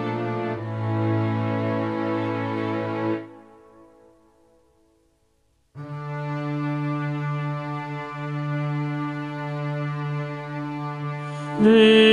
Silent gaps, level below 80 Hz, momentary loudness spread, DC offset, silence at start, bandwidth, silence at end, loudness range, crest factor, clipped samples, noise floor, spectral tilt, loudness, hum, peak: none; -66 dBFS; 9 LU; under 0.1%; 0 s; 11 kHz; 0 s; 9 LU; 20 dB; under 0.1%; -66 dBFS; -7 dB/octave; -25 LUFS; none; -4 dBFS